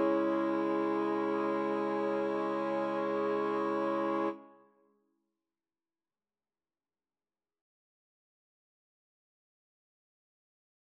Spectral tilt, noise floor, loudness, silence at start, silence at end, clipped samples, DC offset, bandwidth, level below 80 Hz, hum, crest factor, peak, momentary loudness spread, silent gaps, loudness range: -7.5 dB/octave; under -90 dBFS; -33 LUFS; 0 s; 6.4 s; under 0.1%; under 0.1%; 6.2 kHz; under -90 dBFS; none; 16 dB; -18 dBFS; 2 LU; none; 7 LU